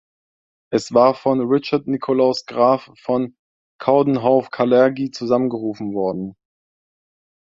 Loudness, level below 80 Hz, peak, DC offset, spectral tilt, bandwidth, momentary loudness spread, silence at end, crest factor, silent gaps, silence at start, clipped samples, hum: -19 LUFS; -62 dBFS; 0 dBFS; under 0.1%; -6.5 dB/octave; 7.8 kHz; 10 LU; 1.25 s; 18 dB; 3.39-3.79 s; 0.7 s; under 0.1%; none